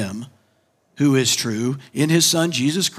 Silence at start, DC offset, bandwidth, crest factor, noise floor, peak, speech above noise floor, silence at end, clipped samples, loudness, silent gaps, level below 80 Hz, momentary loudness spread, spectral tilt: 0 s; under 0.1%; 16 kHz; 16 dB; -63 dBFS; -4 dBFS; 44 dB; 0 s; under 0.1%; -19 LUFS; none; -70 dBFS; 10 LU; -3.5 dB/octave